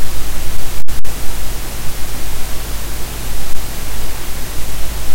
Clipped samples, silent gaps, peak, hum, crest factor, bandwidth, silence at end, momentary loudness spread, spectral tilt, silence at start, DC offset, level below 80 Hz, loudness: 2%; none; 0 dBFS; none; 8 dB; 16.5 kHz; 0 s; 1 LU; -3.5 dB/octave; 0 s; under 0.1%; -22 dBFS; -25 LUFS